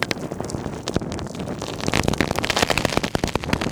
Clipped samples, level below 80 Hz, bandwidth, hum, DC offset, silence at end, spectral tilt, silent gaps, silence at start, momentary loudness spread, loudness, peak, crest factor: under 0.1%; -38 dBFS; over 20 kHz; none; under 0.1%; 0 s; -4 dB/octave; none; 0 s; 10 LU; -24 LUFS; 0 dBFS; 24 dB